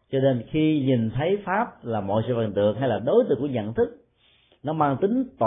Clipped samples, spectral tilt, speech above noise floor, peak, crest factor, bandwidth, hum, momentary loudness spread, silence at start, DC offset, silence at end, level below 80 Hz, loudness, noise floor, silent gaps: under 0.1%; -12 dB/octave; 39 dB; -8 dBFS; 16 dB; 3.9 kHz; none; 6 LU; 0.1 s; under 0.1%; 0 s; -54 dBFS; -24 LUFS; -62 dBFS; none